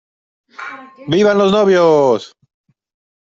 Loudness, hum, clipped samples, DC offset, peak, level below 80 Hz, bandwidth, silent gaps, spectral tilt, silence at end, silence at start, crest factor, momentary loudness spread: -13 LUFS; none; under 0.1%; under 0.1%; -2 dBFS; -56 dBFS; 7.6 kHz; none; -6 dB/octave; 1 s; 0.6 s; 14 dB; 20 LU